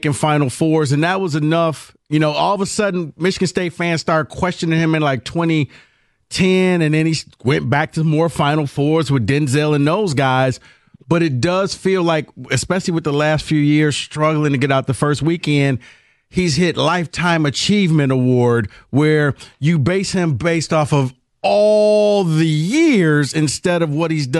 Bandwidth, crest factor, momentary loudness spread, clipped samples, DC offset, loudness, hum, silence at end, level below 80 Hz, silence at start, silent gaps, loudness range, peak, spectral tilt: 12 kHz; 12 dB; 6 LU; under 0.1%; under 0.1%; -16 LUFS; none; 0 s; -48 dBFS; 0.05 s; none; 3 LU; -4 dBFS; -6 dB/octave